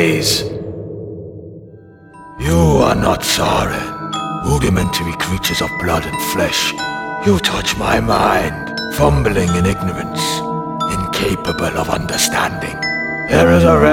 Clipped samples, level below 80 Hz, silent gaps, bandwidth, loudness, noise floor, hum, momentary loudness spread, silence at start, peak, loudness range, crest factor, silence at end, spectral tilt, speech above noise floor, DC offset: under 0.1%; -30 dBFS; none; 18 kHz; -16 LUFS; -39 dBFS; none; 10 LU; 0 s; 0 dBFS; 2 LU; 16 dB; 0 s; -4.5 dB/octave; 24 dB; under 0.1%